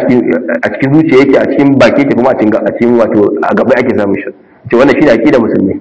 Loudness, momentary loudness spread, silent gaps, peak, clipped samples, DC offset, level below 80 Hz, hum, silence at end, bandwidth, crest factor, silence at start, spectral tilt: -8 LUFS; 6 LU; none; 0 dBFS; 4%; 0.4%; -42 dBFS; none; 0 s; 8 kHz; 8 dB; 0 s; -7.5 dB/octave